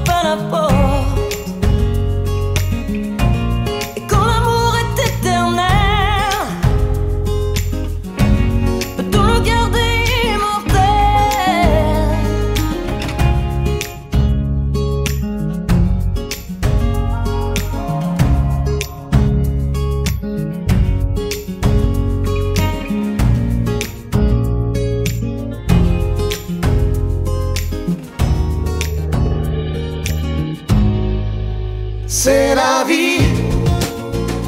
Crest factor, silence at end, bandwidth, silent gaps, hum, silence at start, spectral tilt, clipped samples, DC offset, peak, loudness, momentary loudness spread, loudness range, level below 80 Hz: 16 dB; 0 s; 16.5 kHz; none; none; 0 s; -5.5 dB/octave; under 0.1%; under 0.1%; 0 dBFS; -17 LUFS; 8 LU; 4 LU; -20 dBFS